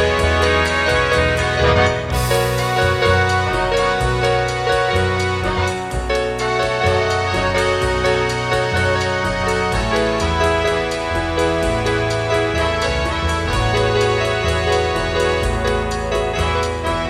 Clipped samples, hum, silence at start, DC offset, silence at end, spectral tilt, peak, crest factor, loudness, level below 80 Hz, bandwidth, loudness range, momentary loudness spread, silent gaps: under 0.1%; none; 0 s; under 0.1%; 0 s; -4.5 dB/octave; -2 dBFS; 16 dB; -17 LUFS; -28 dBFS; 15.5 kHz; 2 LU; 4 LU; none